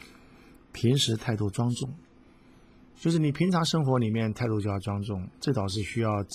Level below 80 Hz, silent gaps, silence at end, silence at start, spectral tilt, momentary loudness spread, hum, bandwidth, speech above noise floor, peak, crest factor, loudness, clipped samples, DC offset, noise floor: -52 dBFS; none; 0 s; 0 s; -6 dB/octave; 8 LU; none; 15 kHz; 28 dB; -12 dBFS; 16 dB; -28 LUFS; under 0.1%; under 0.1%; -55 dBFS